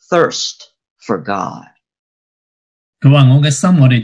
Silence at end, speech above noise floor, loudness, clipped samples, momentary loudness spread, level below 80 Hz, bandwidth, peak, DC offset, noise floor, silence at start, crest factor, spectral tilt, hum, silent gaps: 0 s; over 79 dB; -12 LUFS; 0.2%; 13 LU; -56 dBFS; 10.5 kHz; 0 dBFS; under 0.1%; under -90 dBFS; 0.1 s; 14 dB; -6 dB/octave; none; 0.90-0.96 s, 1.99-2.93 s